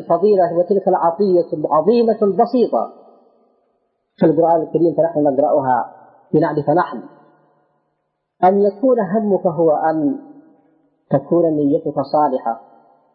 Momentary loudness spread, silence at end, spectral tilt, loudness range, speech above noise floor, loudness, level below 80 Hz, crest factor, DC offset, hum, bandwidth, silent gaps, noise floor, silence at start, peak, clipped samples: 7 LU; 0.55 s; -13 dB/octave; 3 LU; 56 dB; -16 LUFS; -66 dBFS; 14 dB; under 0.1%; none; 5.6 kHz; none; -71 dBFS; 0 s; -4 dBFS; under 0.1%